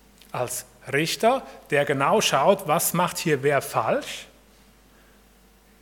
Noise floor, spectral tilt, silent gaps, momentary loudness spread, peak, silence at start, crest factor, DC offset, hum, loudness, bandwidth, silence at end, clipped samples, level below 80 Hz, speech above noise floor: -55 dBFS; -3.5 dB/octave; none; 11 LU; -4 dBFS; 0.35 s; 20 dB; under 0.1%; none; -23 LUFS; 18 kHz; 1.55 s; under 0.1%; -60 dBFS; 32 dB